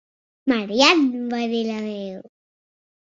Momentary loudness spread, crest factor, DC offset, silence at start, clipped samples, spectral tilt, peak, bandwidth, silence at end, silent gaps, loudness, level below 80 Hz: 17 LU; 20 dB; under 0.1%; 0.45 s; under 0.1%; -3.5 dB/octave; -2 dBFS; 7.8 kHz; 0.85 s; none; -20 LUFS; -64 dBFS